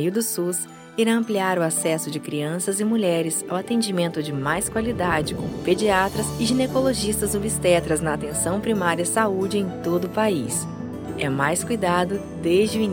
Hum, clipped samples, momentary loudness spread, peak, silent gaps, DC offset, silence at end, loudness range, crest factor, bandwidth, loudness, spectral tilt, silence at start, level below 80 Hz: none; under 0.1%; 7 LU; -4 dBFS; none; under 0.1%; 0 s; 2 LU; 18 dB; 17.5 kHz; -23 LUFS; -4.5 dB/octave; 0 s; -48 dBFS